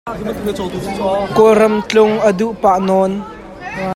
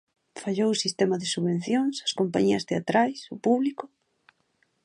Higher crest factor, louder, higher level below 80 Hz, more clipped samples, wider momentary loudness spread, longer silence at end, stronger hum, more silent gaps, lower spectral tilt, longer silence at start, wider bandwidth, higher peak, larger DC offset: about the same, 14 dB vs 18 dB; first, -14 LUFS vs -26 LUFS; first, -42 dBFS vs -70 dBFS; neither; first, 14 LU vs 8 LU; second, 0 s vs 1 s; neither; neither; about the same, -6 dB/octave vs -5 dB/octave; second, 0.05 s vs 0.35 s; first, 16 kHz vs 11.5 kHz; first, 0 dBFS vs -10 dBFS; neither